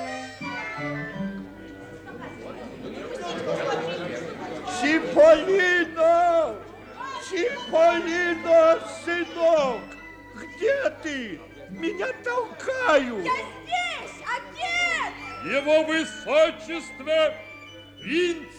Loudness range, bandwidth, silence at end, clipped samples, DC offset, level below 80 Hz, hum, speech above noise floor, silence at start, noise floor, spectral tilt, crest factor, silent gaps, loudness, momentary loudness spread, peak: 11 LU; 10 kHz; 0 s; under 0.1%; under 0.1%; -58 dBFS; none; 22 dB; 0 s; -44 dBFS; -4 dB/octave; 18 dB; none; -24 LUFS; 19 LU; -6 dBFS